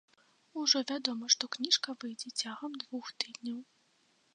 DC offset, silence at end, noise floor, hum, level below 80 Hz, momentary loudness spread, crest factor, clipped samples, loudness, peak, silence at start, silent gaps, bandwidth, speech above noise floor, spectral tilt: under 0.1%; 0.7 s; -71 dBFS; none; under -90 dBFS; 13 LU; 24 dB; under 0.1%; -32 LUFS; -12 dBFS; 0.55 s; none; 10 kHz; 36 dB; 0 dB/octave